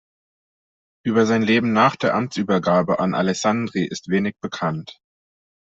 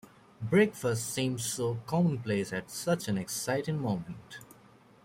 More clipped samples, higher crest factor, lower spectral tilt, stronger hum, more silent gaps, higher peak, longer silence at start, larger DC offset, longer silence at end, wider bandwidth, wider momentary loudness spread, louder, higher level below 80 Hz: neither; about the same, 18 dB vs 18 dB; about the same, -5.5 dB/octave vs -5 dB/octave; neither; neither; first, -4 dBFS vs -14 dBFS; first, 1.05 s vs 0.4 s; neither; first, 0.75 s vs 0.6 s; second, 8 kHz vs 16.5 kHz; second, 9 LU vs 15 LU; first, -20 LUFS vs -31 LUFS; first, -60 dBFS vs -66 dBFS